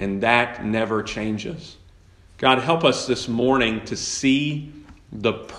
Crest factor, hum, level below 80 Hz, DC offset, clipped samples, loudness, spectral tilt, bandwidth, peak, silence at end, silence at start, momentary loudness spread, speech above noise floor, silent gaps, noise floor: 22 dB; none; -50 dBFS; under 0.1%; under 0.1%; -21 LUFS; -4.5 dB/octave; 11 kHz; 0 dBFS; 0 s; 0 s; 12 LU; 29 dB; none; -50 dBFS